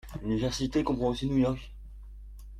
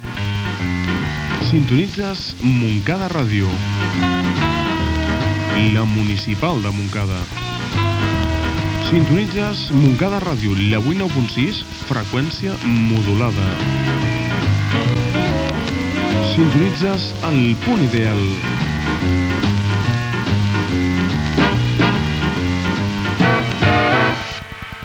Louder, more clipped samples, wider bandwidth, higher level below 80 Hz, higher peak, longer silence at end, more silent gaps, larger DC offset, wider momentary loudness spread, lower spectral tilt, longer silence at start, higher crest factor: second, -30 LUFS vs -18 LUFS; neither; second, 14.5 kHz vs 16.5 kHz; second, -44 dBFS vs -36 dBFS; second, -16 dBFS vs 0 dBFS; about the same, 0 s vs 0 s; neither; neither; first, 22 LU vs 6 LU; about the same, -6.5 dB/octave vs -6.5 dB/octave; about the same, 0.05 s vs 0 s; about the same, 16 dB vs 16 dB